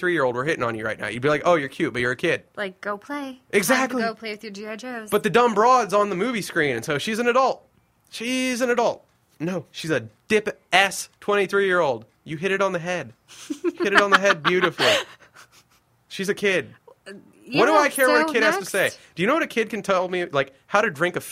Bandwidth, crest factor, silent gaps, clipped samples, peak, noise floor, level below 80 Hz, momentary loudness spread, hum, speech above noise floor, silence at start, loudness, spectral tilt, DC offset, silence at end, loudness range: 16 kHz; 22 dB; none; under 0.1%; 0 dBFS; -61 dBFS; -62 dBFS; 14 LU; none; 39 dB; 0 s; -22 LUFS; -4 dB/octave; under 0.1%; 0 s; 3 LU